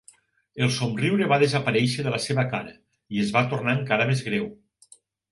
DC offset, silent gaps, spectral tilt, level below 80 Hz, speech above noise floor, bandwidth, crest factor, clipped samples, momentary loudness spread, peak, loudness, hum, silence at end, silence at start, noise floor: under 0.1%; none; -5.5 dB/octave; -62 dBFS; 33 dB; 11.5 kHz; 20 dB; under 0.1%; 11 LU; -6 dBFS; -24 LUFS; none; 0.75 s; 0.55 s; -57 dBFS